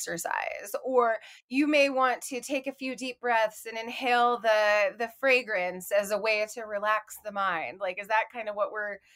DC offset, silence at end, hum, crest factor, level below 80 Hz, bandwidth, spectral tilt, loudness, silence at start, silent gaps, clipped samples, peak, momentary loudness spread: under 0.1%; 0.2 s; none; 16 dB; -76 dBFS; 16 kHz; -2.5 dB/octave; -28 LUFS; 0 s; 1.42-1.48 s; under 0.1%; -12 dBFS; 11 LU